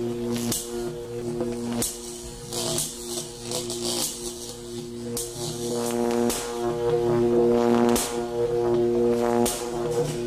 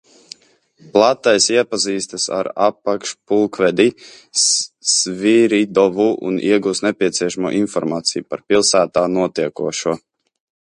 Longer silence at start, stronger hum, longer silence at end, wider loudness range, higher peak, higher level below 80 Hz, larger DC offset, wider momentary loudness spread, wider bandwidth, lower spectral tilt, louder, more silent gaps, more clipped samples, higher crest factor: second, 0 s vs 0.85 s; neither; second, 0 s vs 0.65 s; first, 7 LU vs 2 LU; second, -8 dBFS vs 0 dBFS; first, -48 dBFS vs -60 dBFS; neither; first, 12 LU vs 8 LU; first, 16 kHz vs 11.5 kHz; about the same, -4 dB/octave vs -3 dB/octave; second, -26 LUFS vs -17 LUFS; neither; neither; about the same, 16 dB vs 18 dB